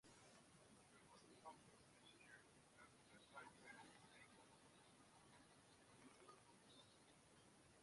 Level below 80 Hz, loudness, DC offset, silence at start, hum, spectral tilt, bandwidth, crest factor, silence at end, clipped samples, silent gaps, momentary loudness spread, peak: -88 dBFS; -67 LUFS; under 0.1%; 0.05 s; none; -3 dB/octave; 11.5 kHz; 20 dB; 0 s; under 0.1%; none; 7 LU; -48 dBFS